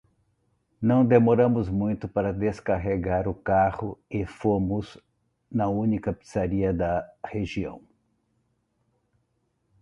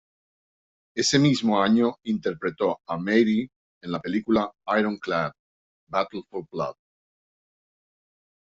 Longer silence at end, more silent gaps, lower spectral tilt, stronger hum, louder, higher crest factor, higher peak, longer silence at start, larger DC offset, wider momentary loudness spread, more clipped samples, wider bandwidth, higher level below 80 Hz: first, 2.05 s vs 1.8 s; second, none vs 3.56-3.81 s, 5.39-5.87 s; first, -9 dB/octave vs -5 dB/octave; neither; about the same, -25 LUFS vs -25 LUFS; about the same, 20 dB vs 20 dB; about the same, -6 dBFS vs -6 dBFS; second, 0.8 s vs 0.95 s; neither; about the same, 13 LU vs 13 LU; neither; first, 10.5 kHz vs 8.2 kHz; first, -46 dBFS vs -62 dBFS